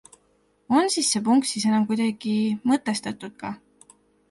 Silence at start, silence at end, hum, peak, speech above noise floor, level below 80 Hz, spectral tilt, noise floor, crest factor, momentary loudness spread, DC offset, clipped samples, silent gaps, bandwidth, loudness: 0.7 s; 0.75 s; none; -6 dBFS; 42 dB; -68 dBFS; -3.5 dB/octave; -65 dBFS; 18 dB; 14 LU; under 0.1%; under 0.1%; none; 11.5 kHz; -23 LUFS